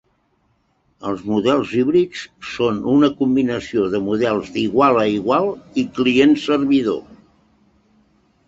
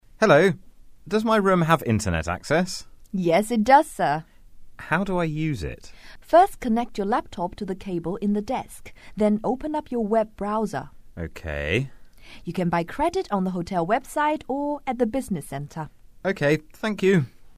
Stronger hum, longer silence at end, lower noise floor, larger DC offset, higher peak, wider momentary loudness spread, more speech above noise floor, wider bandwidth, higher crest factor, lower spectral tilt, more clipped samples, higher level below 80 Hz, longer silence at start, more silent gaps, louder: neither; first, 1.35 s vs 0.05 s; first, -64 dBFS vs -42 dBFS; neither; about the same, -2 dBFS vs -4 dBFS; second, 10 LU vs 16 LU; first, 46 dB vs 19 dB; second, 7.8 kHz vs 15.5 kHz; about the same, 16 dB vs 20 dB; about the same, -6.5 dB/octave vs -6 dB/octave; neither; second, -54 dBFS vs -46 dBFS; first, 1 s vs 0.2 s; neither; first, -18 LUFS vs -24 LUFS